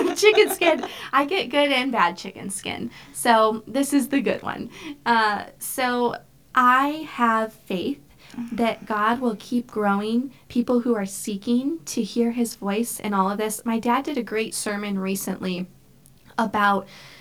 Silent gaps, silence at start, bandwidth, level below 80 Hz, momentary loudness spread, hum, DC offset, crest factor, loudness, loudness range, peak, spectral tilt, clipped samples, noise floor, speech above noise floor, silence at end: none; 0 s; 19 kHz; -62 dBFS; 12 LU; none; 0.1%; 20 dB; -23 LUFS; 3 LU; -2 dBFS; -4 dB/octave; under 0.1%; -53 dBFS; 31 dB; 0.05 s